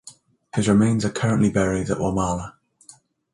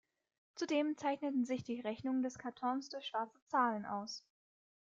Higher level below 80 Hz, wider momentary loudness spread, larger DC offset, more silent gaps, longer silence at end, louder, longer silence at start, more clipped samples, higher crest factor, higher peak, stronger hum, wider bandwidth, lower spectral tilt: first, -44 dBFS vs -82 dBFS; first, 11 LU vs 8 LU; neither; second, none vs 3.42-3.47 s; first, 0.85 s vs 0.7 s; first, -21 LUFS vs -39 LUFS; second, 0.05 s vs 0.55 s; neither; about the same, 18 dB vs 18 dB; first, -6 dBFS vs -22 dBFS; neither; first, 11.5 kHz vs 7.6 kHz; first, -6.5 dB/octave vs -4.5 dB/octave